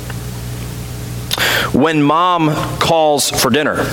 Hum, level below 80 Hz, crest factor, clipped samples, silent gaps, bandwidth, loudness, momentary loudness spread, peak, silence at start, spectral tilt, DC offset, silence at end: none; -36 dBFS; 14 dB; under 0.1%; none; 19 kHz; -13 LUFS; 13 LU; 0 dBFS; 0 s; -4 dB/octave; under 0.1%; 0 s